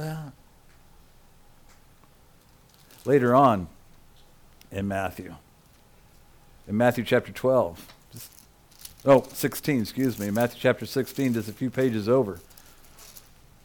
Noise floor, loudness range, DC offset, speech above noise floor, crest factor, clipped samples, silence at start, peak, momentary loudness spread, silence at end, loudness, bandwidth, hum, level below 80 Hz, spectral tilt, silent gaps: -56 dBFS; 5 LU; under 0.1%; 32 dB; 20 dB; under 0.1%; 0 s; -8 dBFS; 24 LU; 0.45 s; -25 LUFS; 19 kHz; none; -56 dBFS; -6 dB/octave; none